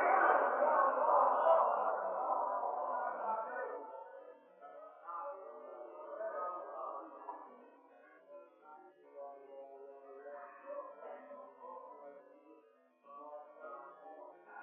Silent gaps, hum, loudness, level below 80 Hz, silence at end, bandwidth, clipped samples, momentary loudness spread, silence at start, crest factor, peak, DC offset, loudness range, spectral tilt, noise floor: none; none; -35 LUFS; under -90 dBFS; 0 s; 3.6 kHz; under 0.1%; 26 LU; 0 s; 22 dB; -16 dBFS; under 0.1%; 20 LU; 6 dB/octave; -67 dBFS